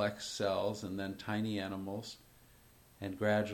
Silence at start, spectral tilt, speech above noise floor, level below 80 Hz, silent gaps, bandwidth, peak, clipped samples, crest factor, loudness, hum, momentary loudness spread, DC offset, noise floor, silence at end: 0 s; -5 dB/octave; 26 dB; -68 dBFS; none; 17.5 kHz; -20 dBFS; under 0.1%; 18 dB; -38 LUFS; none; 12 LU; under 0.1%; -62 dBFS; 0 s